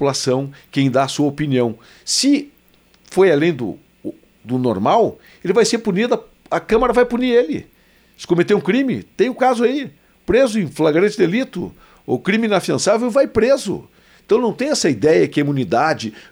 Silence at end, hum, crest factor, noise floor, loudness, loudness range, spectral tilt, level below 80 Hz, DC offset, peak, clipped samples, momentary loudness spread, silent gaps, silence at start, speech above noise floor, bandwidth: 0.1 s; none; 14 dB; -54 dBFS; -17 LUFS; 2 LU; -5 dB/octave; -48 dBFS; under 0.1%; -4 dBFS; under 0.1%; 11 LU; none; 0 s; 37 dB; over 20 kHz